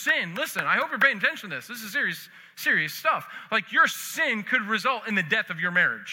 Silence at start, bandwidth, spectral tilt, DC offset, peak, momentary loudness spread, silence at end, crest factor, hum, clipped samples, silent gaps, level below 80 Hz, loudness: 0 s; 17 kHz; -3 dB/octave; under 0.1%; -6 dBFS; 9 LU; 0 s; 20 dB; none; under 0.1%; none; -82 dBFS; -24 LUFS